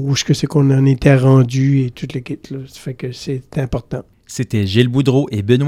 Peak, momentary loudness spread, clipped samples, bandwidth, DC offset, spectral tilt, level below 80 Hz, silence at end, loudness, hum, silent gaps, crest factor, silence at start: 0 dBFS; 16 LU; under 0.1%; 11.5 kHz; under 0.1%; -6.5 dB/octave; -40 dBFS; 0 s; -15 LUFS; none; none; 16 dB; 0 s